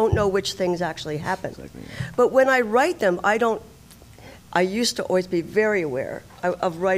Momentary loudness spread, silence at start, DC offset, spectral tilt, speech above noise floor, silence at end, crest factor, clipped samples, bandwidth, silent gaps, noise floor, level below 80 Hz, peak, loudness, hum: 12 LU; 0 s; under 0.1%; -4.5 dB/octave; 25 dB; 0 s; 18 dB; under 0.1%; 16 kHz; none; -47 dBFS; -46 dBFS; -6 dBFS; -22 LUFS; none